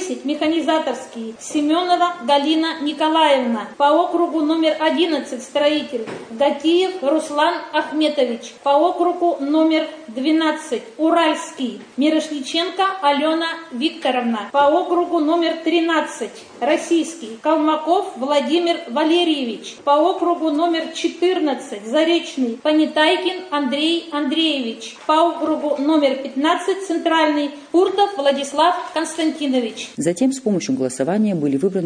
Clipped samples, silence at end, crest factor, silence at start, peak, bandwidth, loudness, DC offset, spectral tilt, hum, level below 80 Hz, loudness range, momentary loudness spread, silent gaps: under 0.1%; 0 s; 16 dB; 0 s; -2 dBFS; 10 kHz; -19 LUFS; under 0.1%; -4 dB/octave; none; -70 dBFS; 2 LU; 8 LU; none